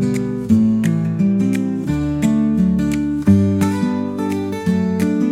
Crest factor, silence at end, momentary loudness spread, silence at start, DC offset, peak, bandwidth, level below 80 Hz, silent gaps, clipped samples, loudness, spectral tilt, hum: 14 dB; 0 s; 7 LU; 0 s; under 0.1%; -2 dBFS; 14.5 kHz; -40 dBFS; none; under 0.1%; -17 LUFS; -8 dB/octave; none